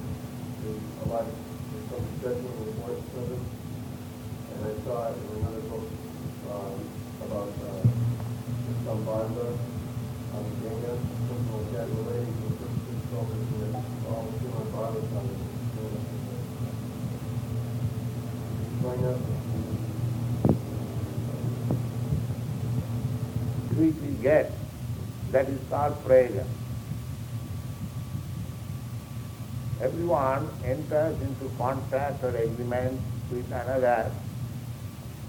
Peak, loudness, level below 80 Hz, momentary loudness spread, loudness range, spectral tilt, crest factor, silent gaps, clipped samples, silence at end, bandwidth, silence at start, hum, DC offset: -8 dBFS; -31 LUFS; -48 dBFS; 11 LU; 7 LU; -7.5 dB/octave; 22 dB; none; under 0.1%; 0 s; 18.5 kHz; 0 s; none; under 0.1%